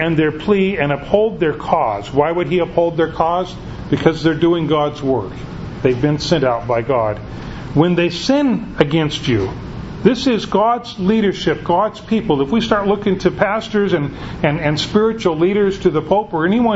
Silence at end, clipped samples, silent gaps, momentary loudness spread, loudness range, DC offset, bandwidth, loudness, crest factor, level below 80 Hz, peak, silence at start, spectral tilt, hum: 0 s; under 0.1%; none; 5 LU; 1 LU; under 0.1%; 8 kHz; -17 LUFS; 16 dB; -38 dBFS; 0 dBFS; 0 s; -6.5 dB/octave; none